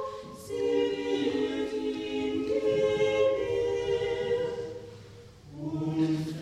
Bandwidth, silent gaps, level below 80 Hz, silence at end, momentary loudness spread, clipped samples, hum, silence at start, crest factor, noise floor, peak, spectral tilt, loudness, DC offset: 13.5 kHz; none; -58 dBFS; 0 s; 14 LU; under 0.1%; none; 0 s; 14 dB; -49 dBFS; -14 dBFS; -6 dB/octave; -29 LUFS; under 0.1%